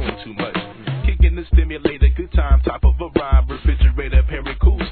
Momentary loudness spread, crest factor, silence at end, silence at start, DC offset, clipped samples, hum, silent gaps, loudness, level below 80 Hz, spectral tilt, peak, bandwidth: 8 LU; 14 dB; 0 s; 0 s; 0.3%; under 0.1%; none; none; -19 LUFS; -16 dBFS; -11 dB/octave; -2 dBFS; 4.5 kHz